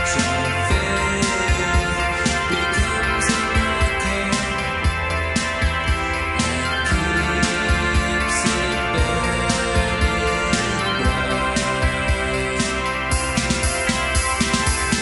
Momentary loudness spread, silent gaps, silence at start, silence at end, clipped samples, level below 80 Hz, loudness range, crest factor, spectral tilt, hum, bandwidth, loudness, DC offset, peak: 2 LU; none; 0 s; 0 s; under 0.1%; -28 dBFS; 1 LU; 16 dB; -3.5 dB/octave; none; 11.5 kHz; -20 LUFS; 0.1%; -4 dBFS